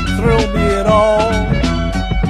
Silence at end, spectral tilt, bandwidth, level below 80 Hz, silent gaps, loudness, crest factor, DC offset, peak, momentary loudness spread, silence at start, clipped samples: 0 s; -6.5 dB/octave; 12.5 kHz; -20 dBFS; none; -14 LUFS; 14 dB; under 0.1%; 0 dBFS; 6 LU; 0 s; under 0.1%